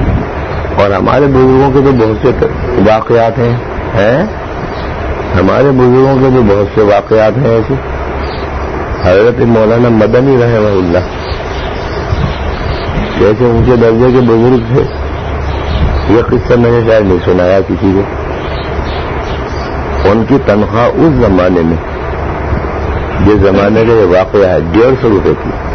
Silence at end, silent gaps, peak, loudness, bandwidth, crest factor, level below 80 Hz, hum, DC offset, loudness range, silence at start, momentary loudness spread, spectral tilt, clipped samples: 0 s; none; 0 dBFS; -10 LUFS; 6.4 kHz; 8 dB; -20 dBFS; none; under 0.1%; 3 LU; 0 s; 10 LU; -8.5 dB/octave; under 0.1%